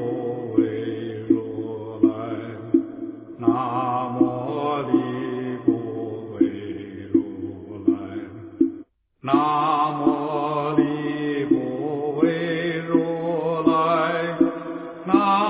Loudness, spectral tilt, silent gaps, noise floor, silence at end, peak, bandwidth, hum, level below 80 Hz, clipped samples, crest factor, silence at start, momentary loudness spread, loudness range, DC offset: -23 LUFS; -11 dB/octave; none; -44 dBFS; 0 s; -4 dBFS; 4 kHz; none; -60 dBFS; under 0.1%; 20 dB; 0 s; 12 LU; 3 LU; under 0.1%